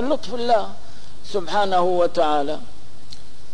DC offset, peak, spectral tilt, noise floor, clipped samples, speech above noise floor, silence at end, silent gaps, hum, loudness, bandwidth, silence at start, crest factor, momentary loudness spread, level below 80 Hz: 10%; -6 dBFS; -5 dB/octave; -45 dBFS; under 0.1%; 24 dB; 0.4 s; none; none; -21 LUFS; 10.5 kHz; 0 s; 14 dB; 24 LU; -52 dBFS